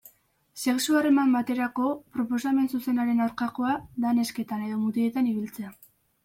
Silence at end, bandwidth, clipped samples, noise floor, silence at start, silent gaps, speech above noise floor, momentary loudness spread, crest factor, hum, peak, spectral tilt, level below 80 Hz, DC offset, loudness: 0.55 s; 16.5 kHz; under 0.1%; -61 dBFS; 0.55 s; none; 35 dB; 10 LU; 14 dB; none; -12 dBFS; -4.5 dB/octave; -66 dBFS; under 0.1%; -26 LUFS